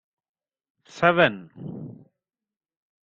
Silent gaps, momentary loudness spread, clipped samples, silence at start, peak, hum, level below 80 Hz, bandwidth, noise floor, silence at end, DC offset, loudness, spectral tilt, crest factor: none; 21 LU; under 0.1%; 0.95 s; -2 dBFS; none; -66 dBFS; 7.6 kHz; under -90 dBFS; 1.15 s; under 0.1%; -21 LUFS; -6 dB/octave; 26 dB